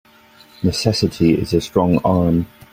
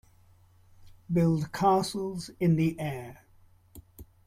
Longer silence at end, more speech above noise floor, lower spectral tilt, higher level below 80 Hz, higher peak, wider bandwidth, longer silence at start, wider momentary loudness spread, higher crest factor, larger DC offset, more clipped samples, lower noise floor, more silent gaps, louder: about the same, 0.25 s vs 0.25 s; about the same, 31 dB vs 32 dB; about the same, -6.5 dB/octave vs -7 dB/octave; first, -42 dBFS vs -58 dBFS; first, 0 dBFS vs -12 dBFS; about the same, 16 kHz vs 15 kHz; second, 0.6 s vs 0.8 s; second, 5 LU vs 11 LU; about the same, 16 dB vs 18 dB; neither; neither; second, -48 dBFS vs -59 dBFS; neither; first, -17 LUFS vs -28 LUFS